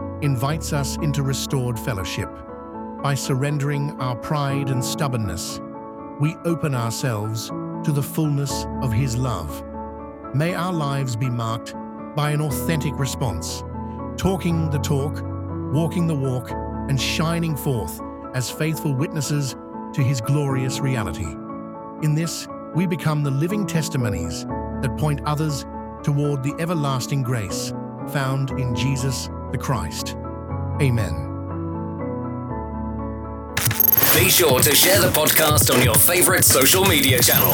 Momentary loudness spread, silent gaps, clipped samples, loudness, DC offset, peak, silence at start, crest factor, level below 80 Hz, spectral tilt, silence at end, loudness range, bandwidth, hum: 16 LU; none; under 0.1%; -21 LUFS; under 0.1%; -2 dBFS; 0 s; 20 dB; -40 dBFS; -4 dB/octave; 0 s; 10 LU; over 20 kHz; none